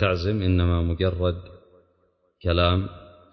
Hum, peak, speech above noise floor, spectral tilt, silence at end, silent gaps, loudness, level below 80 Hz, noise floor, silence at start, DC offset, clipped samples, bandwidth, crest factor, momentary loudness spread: none; -6 dBFS; 44 dB; -8.5 dB/octave; 0.25 s; none; -24 LUFS; -32 dBFS; -67 dBFS; 0 s; under 0.1%; under 0.1%; 6 kHz; 18 dB; 10 LU